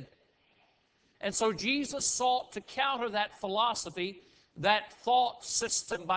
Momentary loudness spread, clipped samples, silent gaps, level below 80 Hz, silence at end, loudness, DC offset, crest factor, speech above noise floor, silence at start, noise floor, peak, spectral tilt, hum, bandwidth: 7 LU; under 0.1%; none; -68 dBFS; 0 s; -31 LUFS; under 0.1%; 22 dB; 39 dB; 0 s; -70 dBFS; -10 dBFS; -2 dB/octave; none; 8 kHz